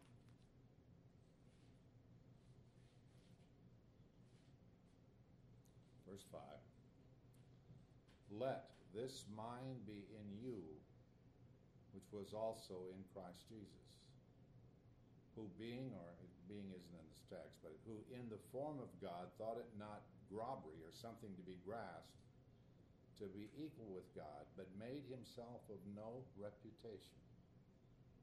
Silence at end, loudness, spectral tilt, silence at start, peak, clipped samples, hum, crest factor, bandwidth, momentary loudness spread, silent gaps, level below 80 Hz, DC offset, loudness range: 0 s; -55 LUFS; -6.5 dB/octave; 0 s; -34 dBFS; under 0.1%; none; 22 dB; 13 kHz; 18 LU; none; -78 dBFS; under 0.1%; 14 LU